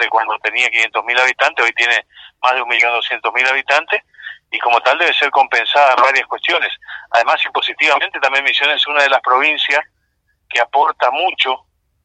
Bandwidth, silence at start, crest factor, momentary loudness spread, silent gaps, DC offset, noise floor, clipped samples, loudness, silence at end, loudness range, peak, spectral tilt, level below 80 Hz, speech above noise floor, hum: 9.2 kHz; 0 s; 16 dB; 6 LU; none; under 0.1%; -65 dBFS; under 0.1%; -14 LUFS; 0.5 s; 2 LU; 0 dBFS; 0.5 dB/octave; -68 dBFS; 50 dB; none